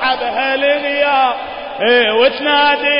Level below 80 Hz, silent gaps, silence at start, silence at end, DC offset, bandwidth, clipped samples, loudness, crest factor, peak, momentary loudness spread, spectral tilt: -52 dBFS; none; 0 s; 0 s; under 0.1%; 5.4 kHz; under 0.1%; -13 LUFS; 12 dB; -2 dBFS; 6 LU; -7.5 dB/octave